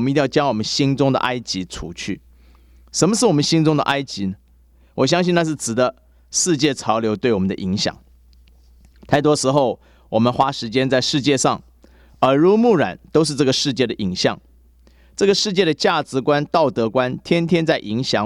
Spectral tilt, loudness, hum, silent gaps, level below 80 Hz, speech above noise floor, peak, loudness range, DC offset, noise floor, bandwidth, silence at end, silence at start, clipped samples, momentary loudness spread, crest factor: -4.5 dB/octave; -18 LUFS; none; none; -50 dBFS; 34 dB; 0 dBFS; 3 LU; under 0.1%; -52 dBFS; 14 kHz; 0 s; 0 s; under 0.1%; 10 LU; 18 dB